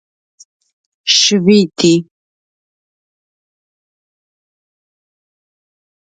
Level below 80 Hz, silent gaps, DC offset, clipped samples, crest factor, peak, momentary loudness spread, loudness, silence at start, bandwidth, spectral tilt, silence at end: -60 dBFS; none; under 0.1%; under 0.1%; 18 dB; 0 dBFS; 7 LU; -11 LUFS; 1.05 s; 9.4 kHz; -4 dB/octave; 4.15 s